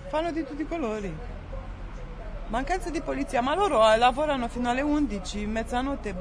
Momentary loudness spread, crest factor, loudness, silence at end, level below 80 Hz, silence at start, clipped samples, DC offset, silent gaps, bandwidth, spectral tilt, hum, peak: 19 LU; 20 dB; -26 LUFS; 0 s; -38 dBFS; 0 s; under 0.1%; under 0.1%; none; 11 kHz; -5 dB/octave; none; -6 dBFS